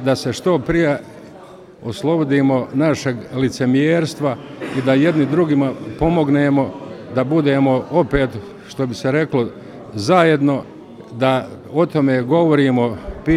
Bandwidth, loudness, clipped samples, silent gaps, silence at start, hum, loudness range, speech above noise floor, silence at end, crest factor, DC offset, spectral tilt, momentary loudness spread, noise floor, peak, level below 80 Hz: 12.5 kHz; -17 LUFS; under 0.1%; none; 0 s; none; 2 LU; 23 dB; 0 s; 16 dB; under 0.1%; -7 dB/octave; 11 LU; -39 dBFS; 0 dBFS; -42 dBFS